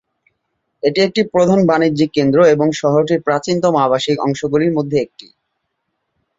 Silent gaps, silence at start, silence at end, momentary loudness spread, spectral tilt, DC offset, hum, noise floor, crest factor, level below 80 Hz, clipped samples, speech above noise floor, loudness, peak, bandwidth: none; 0.85 s; 1.35 s; 6 LU; -6 dB/octave; under 0.1%; none; -72 dBFS; 14 dB; -54 dBFS; under 0.1%; 58 dB; -15 LUFS; 0 dBFS; 7.8 kHz